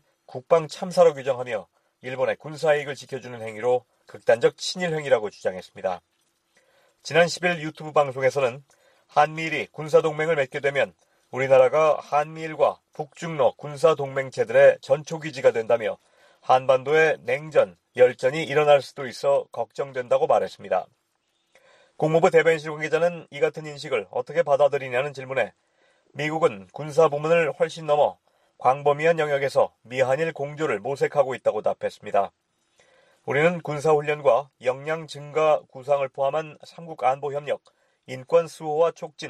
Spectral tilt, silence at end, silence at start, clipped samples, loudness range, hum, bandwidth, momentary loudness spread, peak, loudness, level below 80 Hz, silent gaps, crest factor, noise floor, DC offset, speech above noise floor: -5 dB/octave; 0 s; 0.3 s; under 0.1%; 4 LU; none; 12 kHz; 12 LU; -4 dBFS; -23 LUFS; -70 dBFS; none; 20 dB; -72 dBFS; under 0.1%; 49 dB